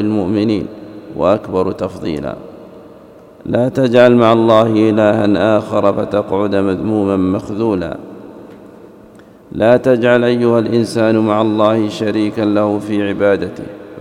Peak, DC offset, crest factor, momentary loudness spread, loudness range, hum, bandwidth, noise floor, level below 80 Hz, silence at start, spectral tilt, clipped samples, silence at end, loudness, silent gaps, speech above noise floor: 0 dBFS; under 0.1%; 14 dB; 18 LU; 7 LU; none; 11.5 kHz; -40 dBFS; -48 dBFS; 0 s; -7.5 dB/octave; under 0.1%; 0 s; -14 LUFS; none; 27 dB